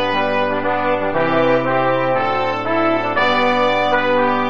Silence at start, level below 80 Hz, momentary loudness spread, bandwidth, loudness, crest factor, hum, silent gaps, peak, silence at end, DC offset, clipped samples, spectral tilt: 0 s; -54 dBFS; 3 LU; 7.4 kHz; -17 LUFS; 14 dB; none; none; -4 dBFS; 0 s; 3%; under 0.1%; -6 dB/octave